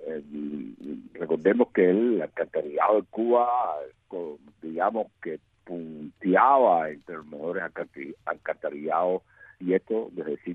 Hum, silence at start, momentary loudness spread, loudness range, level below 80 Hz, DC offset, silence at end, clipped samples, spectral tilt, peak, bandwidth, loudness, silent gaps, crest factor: none; 0 s; 17 LU; 6 LU; -72 dBFS; under 0.1%; 0 s; under 0.1%; -9 dB/octave; -6 dBFS; 3.9 kHz; -26 LUFS; none; 20 dB